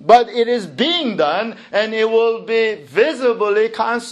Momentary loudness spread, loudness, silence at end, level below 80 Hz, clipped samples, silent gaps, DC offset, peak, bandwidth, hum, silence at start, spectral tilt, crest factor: 5 LU; -17 LUFS; 0 s; -62 dBFS; under 0.1%; none; under 0.1%; 0 dBFS; 11 kHz; none; 0 s; -4 dB/octave; 16 dB